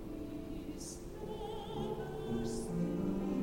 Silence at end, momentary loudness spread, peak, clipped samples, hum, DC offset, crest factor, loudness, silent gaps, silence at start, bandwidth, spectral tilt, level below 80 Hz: 0 s; 9 LU; -26 dBFS; under 0.1%; none; under 0.1%; 14 dB; -41 LUFS; none; 0 s; 16.5 kHz; -6.5 dB/octave; -50 dBFS